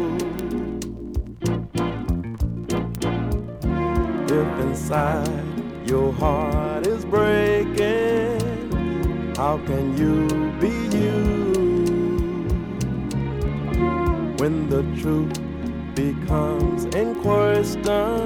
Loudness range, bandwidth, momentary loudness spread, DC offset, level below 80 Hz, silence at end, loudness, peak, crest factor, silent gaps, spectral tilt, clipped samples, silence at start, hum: 3 LU; 19.5 kHz; 7 LU; under 0.1%; -32 dBFS; 0 s; -23 LUFS; -6 dBFS; 16 dB; none; -7 dB/octave; under 0.1%; 0 s; none